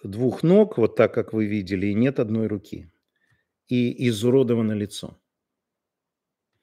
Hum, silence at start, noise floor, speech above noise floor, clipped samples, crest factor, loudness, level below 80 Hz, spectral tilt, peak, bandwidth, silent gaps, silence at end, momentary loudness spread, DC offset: none; 0.05 s; -85 dBFS; 63 dB; under 0.1%; 20 dB; -22 LUFS; -62 dBFS; -7.5 dB/octave; -4 dBFS; 15.5 kHz; none; 1.55 s; 14 LU; under 0.1%